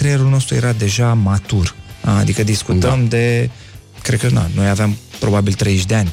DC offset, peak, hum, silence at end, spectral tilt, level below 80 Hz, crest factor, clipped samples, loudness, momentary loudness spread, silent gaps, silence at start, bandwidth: under 0.1%; -2 dBFS; none; 0 s; -5.5 dB/octave; -36 dBFS; 14 dB; under 0.1%; -16 LUFS; 5 LU; none; 0 s; 15.5 kHz